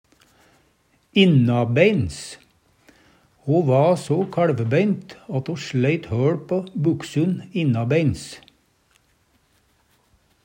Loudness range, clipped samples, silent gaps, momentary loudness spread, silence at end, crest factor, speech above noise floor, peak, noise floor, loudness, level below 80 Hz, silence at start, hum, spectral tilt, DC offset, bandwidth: 4 LU; under 0.1%; none; 12 LU; 2.05 s; 20 dB; 43 dB; -2 dBFS; -63 dBFS; -21 LUFS; -54 dBFS; 1.15 s; none; -7 dB/octave; under 0.1%; 15.5 kHz